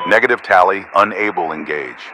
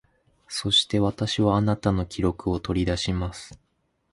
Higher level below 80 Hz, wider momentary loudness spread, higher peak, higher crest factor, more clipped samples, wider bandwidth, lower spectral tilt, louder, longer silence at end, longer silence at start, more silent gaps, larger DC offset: second, -58 dBFS vs -40 dBFS; about the same, 10 LU vs 12 LU; first, 0 dBFS vs -8 dBFS; about the same, 16 dB vs 18 dB; first, 0.3% vs under 0.1%; about the same, 12.5 kHz vs 11.5 kHz; about the same, -4.5 dB/octave vs -5.5 dB/octave; first, -15 LUFS vs -24 LUFS; second, 0 s vs 0.55 s; second, 0 s vs 0.5 s; neither; neither